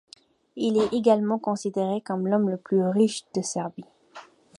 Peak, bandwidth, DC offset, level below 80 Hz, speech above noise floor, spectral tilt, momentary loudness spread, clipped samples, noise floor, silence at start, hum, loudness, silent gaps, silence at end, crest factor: -6 dBFS; 11.5 kHz; under 0.1%; -68 dBFS; 25 dB; -6 dB/octave; 10 LU; under 0.1%; -49 dBFS; 0.55 s; none; -25 LUFS; none; 0.35 s; 18 dB